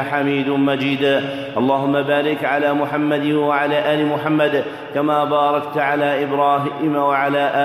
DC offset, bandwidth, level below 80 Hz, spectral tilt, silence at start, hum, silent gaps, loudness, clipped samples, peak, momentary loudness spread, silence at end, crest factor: under 0.1%; 14 kHz; -64 dBFS; -7 dB/octave; 0 s; none; none; -18 LUFS; under 0.1%; -4 dBFS; 2 LU; 0 s; 14 dB